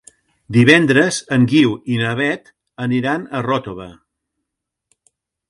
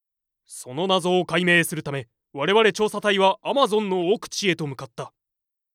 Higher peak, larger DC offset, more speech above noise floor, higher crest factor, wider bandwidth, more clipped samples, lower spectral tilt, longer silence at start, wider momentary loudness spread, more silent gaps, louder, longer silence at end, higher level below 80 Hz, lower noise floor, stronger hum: first, 0 dBFS vs -4 dBFS; neither; about the same, 64 dB vs 62 dB; about the same, 18 dB vs 20 dB; second, 11.5 kHz vs 16 kHz; neither; first, -5.5 dB/octave vs -4 dB/octave; about the same, 0.5 s vs 0.5 s; second, 14 LU vs 18 LU; neither; first, -16 LUFS vs -21 LUFS; first, 1.6 s vs 0.65 s; first, -56 dBFS vs -68 dBFS; second, -80 dBFS vs -84 dBFS; neither